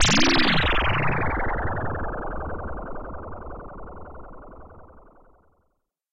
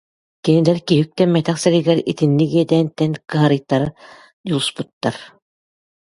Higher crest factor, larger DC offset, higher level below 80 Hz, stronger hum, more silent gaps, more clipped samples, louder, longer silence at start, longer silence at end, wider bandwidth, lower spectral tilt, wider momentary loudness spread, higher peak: about the same, 20 dB vs 18 dB; neither; first, -34 dBFS vs -56 dBFS; neither; second, none vs 4.33-4.44 s, 4.93-5.01 s; neither; second, -24 LUFS vs -17 LUFS; second, 0 s vs 0.45 s; second, 0 s vs 0.85 s; second, 9 kHz vs 11.5 kHz; second, -3.5 dB/octave vs -6.5 dB/octave; first, 24 LU vs 9 LU; second, -6 dBFS vs 0 dBFS